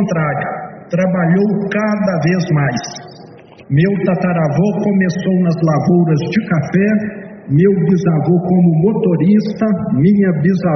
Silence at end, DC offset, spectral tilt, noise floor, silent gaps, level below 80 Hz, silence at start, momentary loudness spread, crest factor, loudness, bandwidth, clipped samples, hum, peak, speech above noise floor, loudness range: 0 s; under 0.1%; -8 dB/octave; -38 dBFS; none; -50 dBFS; 0 s; 6 LU; 12 dB; -14 LUFS; 6.4 kHz; under 0.1%; none; -2 dBFS; 25 dB; 3 LU